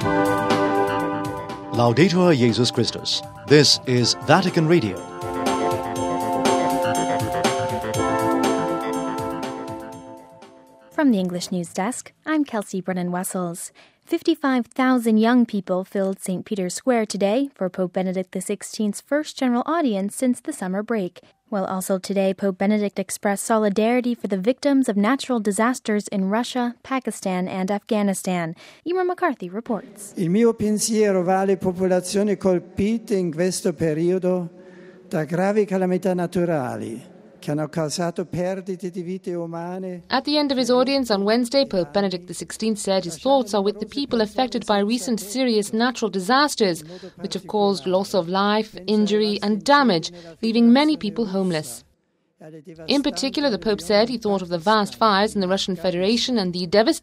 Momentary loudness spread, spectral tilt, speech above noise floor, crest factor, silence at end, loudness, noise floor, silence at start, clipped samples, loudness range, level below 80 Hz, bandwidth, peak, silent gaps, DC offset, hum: 11 LU; -5 dB/octave; 45 dB; 22 dB; 0.05 s; -22 LUFS; -67 dBFS; 0 s; under 0.1%; 6 LU; -56 dBFS; 16 kHz; 0 dBFS; none; under 0.1%; none